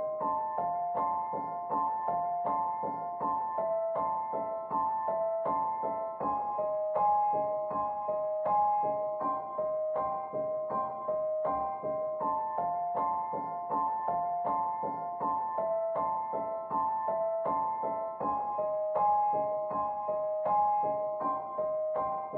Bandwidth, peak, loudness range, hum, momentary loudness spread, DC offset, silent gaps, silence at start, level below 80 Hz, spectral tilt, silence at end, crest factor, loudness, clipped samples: 3.4 kHz; -18 dBFS; 2 LU; none; 6 LU; under 0.1%; none; 0 s; -70 dBFS; -7.5 dB/octave; 0 s; 14 dB; -32 LUFS; under 0.1%